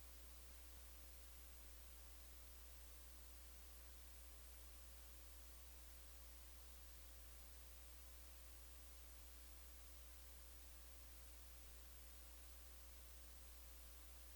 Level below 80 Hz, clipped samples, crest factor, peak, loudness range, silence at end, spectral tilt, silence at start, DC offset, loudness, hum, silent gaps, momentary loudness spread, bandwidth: -62 dBFS; under 0.1%; 12 dB; -48 dBFS; 0 LU; 0 s; -2.5 dB/octave; 0 s; under 0.1%; -59 LUFS; none; none; 0 LU; over 20 kHz